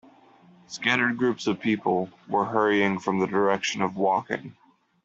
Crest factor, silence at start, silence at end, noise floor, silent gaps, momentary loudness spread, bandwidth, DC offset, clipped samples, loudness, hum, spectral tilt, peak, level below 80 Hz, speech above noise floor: 20 dB; 0.7 s; 0.5 s; -55 dBFS; none; 6 LU; 7.8 kHz; under 0.1%; under 0.1%; -25 LUFS; none; -5 dB/octave; -6 dBFS; -68 dBFS; 30 dB